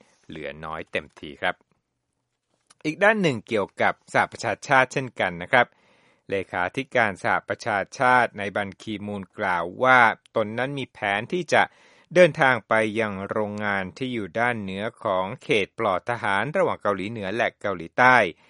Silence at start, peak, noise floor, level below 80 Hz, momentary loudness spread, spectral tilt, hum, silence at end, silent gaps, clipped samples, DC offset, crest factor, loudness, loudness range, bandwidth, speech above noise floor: 0.3 s; 0 dBFS; -78 dBFS; -64 dBFS; 13 LU; -5 dB/octave; none; 0.2 s; none; under 0.1%; under 0.1%; 24 dB; -23 LUFS; 4 LU; 11.5 kHz; 54 dB